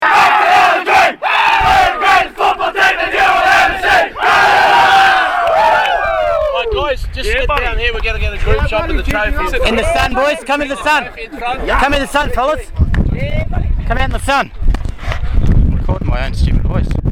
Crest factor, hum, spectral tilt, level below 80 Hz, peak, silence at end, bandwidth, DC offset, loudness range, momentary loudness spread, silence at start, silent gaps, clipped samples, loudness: 12 dB; none; -4.5 dB/octave; -20 dBFS; 0 dBFS; 0 s; 17.5 kHz; under 0.1%; 7 LU; 10 LU; 0 s; none; under 0.1%; -13 LUFS